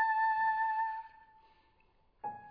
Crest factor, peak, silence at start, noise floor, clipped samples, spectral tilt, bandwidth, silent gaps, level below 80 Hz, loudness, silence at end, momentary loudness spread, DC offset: 14 dB; -22 dBFS; 0 s; -69 dBFS; under 0.1%; -4.5 dB/octave; 5.2 kHz; none; -74 dBFS; -33 LUFS; 0 s; 16 LU; under 0.1%